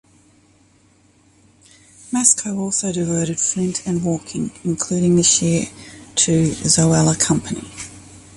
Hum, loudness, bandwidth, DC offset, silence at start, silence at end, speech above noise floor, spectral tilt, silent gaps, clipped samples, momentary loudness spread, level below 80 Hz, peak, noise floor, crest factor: none; -17 LUFS; 11.5 kHz; under 0.1%; 2.05 s; 0.15 s; 36 dB; -4 dB/octave; none; under 0.1%; 15 LU; -48 dBFS; 0 dBFS; -55 dBFS; 20 dB